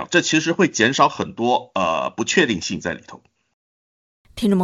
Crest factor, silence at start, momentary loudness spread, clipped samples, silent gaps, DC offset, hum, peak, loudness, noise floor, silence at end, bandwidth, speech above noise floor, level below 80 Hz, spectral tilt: 20 dB; 0 s; 10 LU; under 0.1%; 3.53-4.25 s; under 0.1%; none; -2 dBFS; -19 LUFS; under -90 dBFS; 0 s; 12.5 kHz; over 71 dB; -56 dBFS; -4 dB/octave